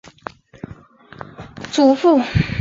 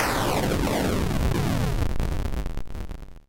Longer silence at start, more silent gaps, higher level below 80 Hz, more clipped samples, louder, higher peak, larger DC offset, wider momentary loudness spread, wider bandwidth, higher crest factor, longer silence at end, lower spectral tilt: first, 0.7 s vs 0 s; neither; second, -38 dBFS vs -30 dBFS; neither; first, -16 LUFS vs -26 LUFS; first, -4 dBFS vs -12 dBFS; neither; first, 24 LU vs 13 LU; second, 7.8 kHz vs 17 kHz; about the same, 16 dB vs 12 dB; about the same, 0 s vs 0.05 s; about the same, -6.5 dB/octave vs -5.5 dB/octave